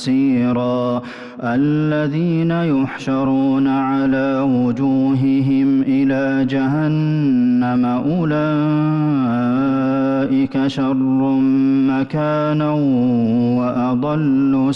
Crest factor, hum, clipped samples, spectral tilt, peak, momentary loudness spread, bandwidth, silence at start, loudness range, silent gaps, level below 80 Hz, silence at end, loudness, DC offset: 6 dB; none; under 0.1%; -8.5 dB/octave; -10 dBFS; 3 LU; 6.8 kHz; 0 s; 1 LU; none; -52 dBFS; 0 s; -17 LUFS; under 0.1%